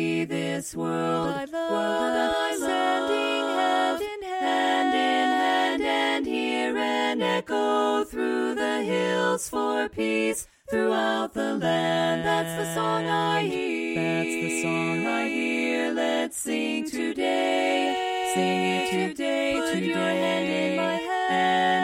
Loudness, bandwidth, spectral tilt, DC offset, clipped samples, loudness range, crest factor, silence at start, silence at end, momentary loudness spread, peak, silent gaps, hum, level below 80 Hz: -25 LUFS; 16 kHz; -4 dB/octave; under 0.1%; under 0.1%; 2 LU; 14 dB; 0 s; 0 s; 5 LU; -10 dBFS; none; none; -60 dBFS